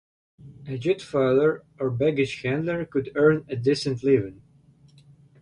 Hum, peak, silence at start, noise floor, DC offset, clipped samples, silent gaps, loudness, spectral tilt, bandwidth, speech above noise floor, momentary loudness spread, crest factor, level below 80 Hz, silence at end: none; -6 dBFS; 0.45 s; -56 dBFS; under 0.1%; under 0.1%; none; -24 LUFS; -7 dB/octave; 11 kHz; 32 dB; 9 LU; 18 dB; -58 dBFS; 1.1 s